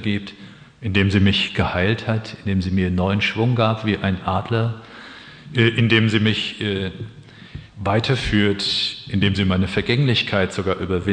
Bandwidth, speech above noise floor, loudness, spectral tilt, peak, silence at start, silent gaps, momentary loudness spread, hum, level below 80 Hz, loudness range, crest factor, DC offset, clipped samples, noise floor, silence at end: 9.8 kHz; 20 dB; -20 LUFS; -6.5 dB/octave; -2 dBFS; 0 s; none; 17 LU; none; -44 dBFS; 2 LU; 18 dB; under 0.1%; under 0.1%; -40 dBFS; 0 s